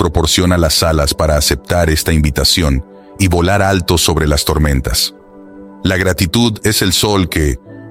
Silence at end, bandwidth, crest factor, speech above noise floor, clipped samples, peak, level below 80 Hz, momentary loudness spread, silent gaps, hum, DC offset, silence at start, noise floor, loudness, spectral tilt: 0 s; 16.5 kHz; 14 dB; 23 dB; under 0.1%; 0 dBFS; -22 dBFS; 6 LU; none; none; 0.2%; 0 s; -35 dBFS; -13 LUFS; -4 dB/octave